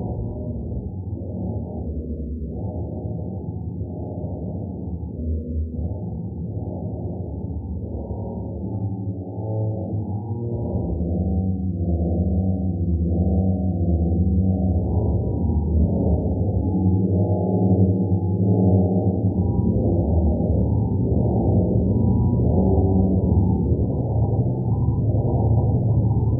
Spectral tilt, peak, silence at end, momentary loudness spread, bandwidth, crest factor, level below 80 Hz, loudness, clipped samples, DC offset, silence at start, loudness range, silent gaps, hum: -16.5 dB/octave; -6 dBFS; 0 s; 11 LU; 1.1 kHz; 16 dB; -30 dBFS; -23 LUFS; under 0.1%; under 0.1%; 0 s; 10 LU; none; none